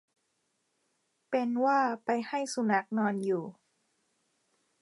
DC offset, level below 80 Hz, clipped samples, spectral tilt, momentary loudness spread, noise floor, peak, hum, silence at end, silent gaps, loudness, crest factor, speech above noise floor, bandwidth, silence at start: under 0.1%; -88 dBFS; under 0.1%; -5.5 dB/octave; 7 LU; -78 dBFS; -14 dBFS; none; 1.3 s; none; -30 LUFS; 18 dB; 48 dB; 11.5 kHz; 1.3 s